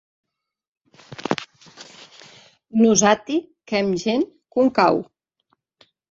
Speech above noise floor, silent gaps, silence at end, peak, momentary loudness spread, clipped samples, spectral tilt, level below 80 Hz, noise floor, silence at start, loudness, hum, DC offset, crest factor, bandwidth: 51 dB; none; 1.1 s; -2 dBFS; 25 LU; under 0.1%; -4 dB/octave; -64 dBFS; -70 dBFS; 1.2 s; -20 LUFS; none; under 0.1%; 22 dB; 7.8 kHz